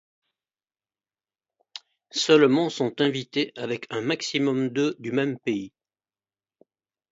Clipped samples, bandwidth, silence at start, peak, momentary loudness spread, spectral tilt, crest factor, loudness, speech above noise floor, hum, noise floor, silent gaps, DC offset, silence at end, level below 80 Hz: under 0.1%; 7.8 kHz; 1.75 s; -6 dBFS; 22 LU; -4.5 dB/octave; 22 dB; -24 LUFS; over 66 dB; none; under -90 dBFS; none; under 0.1%; 1.45 s; -74 dBFS